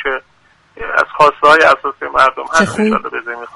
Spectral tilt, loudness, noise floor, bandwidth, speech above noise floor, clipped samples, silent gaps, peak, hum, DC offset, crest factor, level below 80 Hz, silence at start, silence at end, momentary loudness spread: -4 dB/octave; -12 LUFS; -52 dBFS; 11.5 kHz; 40 dB; 0.1%; none; 0 dBFS; none; under 0.1%; 14 dB; -46 dBFS; 0 s; 0.05 s; 15 LU